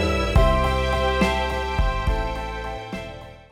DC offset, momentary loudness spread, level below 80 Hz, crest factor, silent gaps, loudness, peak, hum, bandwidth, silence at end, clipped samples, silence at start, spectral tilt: under 0.1%; 14 LU; -26 dBFS; 16 dB; none; -23 LUFS; -6 dBFS; none; 14.5 kHz; 0.1 s; under 0.1%; 0 s; -6 dB/octave